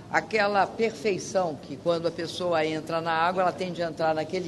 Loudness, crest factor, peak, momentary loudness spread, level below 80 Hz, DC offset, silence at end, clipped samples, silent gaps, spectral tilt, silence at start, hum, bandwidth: -27 LUFS; 20 dB; -8 dBFS; 6 LU; -62 dBFS; under 0.1%; 0 s; under 0.1%; none; -4.5 dB/octave; 0 s; none; 12.5 kHz